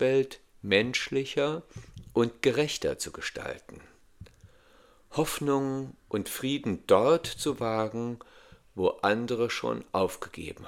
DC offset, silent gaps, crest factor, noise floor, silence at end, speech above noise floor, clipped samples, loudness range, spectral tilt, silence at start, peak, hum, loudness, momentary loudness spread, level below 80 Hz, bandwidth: under 0.1%; none; 22 dB; -59 dBFS; 0 s; 30 dB; under 0.1%; 5 LU; -4.5 dB/octave; 0 s; -8 dBFS; none; -29 LUFS; 14 LU; -58 dBFS; 17 kHz